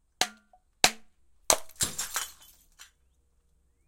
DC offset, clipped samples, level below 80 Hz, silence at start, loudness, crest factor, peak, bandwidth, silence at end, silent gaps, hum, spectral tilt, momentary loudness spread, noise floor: under 0.1%; under 0.1%; -58 dBFS; 0.2 s; -28 LUFS; 34 dB; 0 dBFS; 17 kHz; 1.05 s; none; none; 0 dB/octave; 10 LU; -68 dBFS